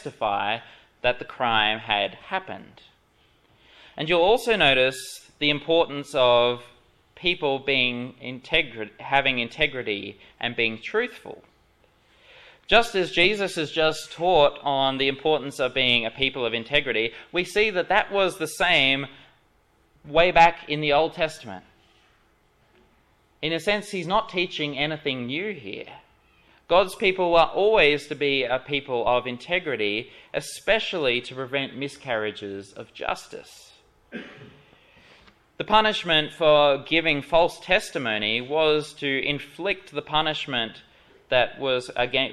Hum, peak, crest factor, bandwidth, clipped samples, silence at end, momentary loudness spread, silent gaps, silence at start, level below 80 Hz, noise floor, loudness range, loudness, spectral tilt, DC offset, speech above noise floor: none; -4 dBFS; 22 dB; 14 kHz; under 0.1%; 0 s; 14 LU; none; 0 s; -50 dBFS; -63 dBFS; 7 LU; -23 LUFS; -4 dB/octave; under 0.1%; 39 dB